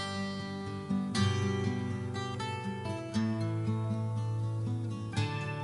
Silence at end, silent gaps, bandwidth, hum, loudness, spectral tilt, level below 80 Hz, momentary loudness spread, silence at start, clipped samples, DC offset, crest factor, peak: 0 s; none; 11.5 kHz; none; -34 LUFS; -6.5 dB/octave; -64 dBFS; 7 LU; 0 s; under 0.1%; under 0.1%; 16 dB; -18 dBFS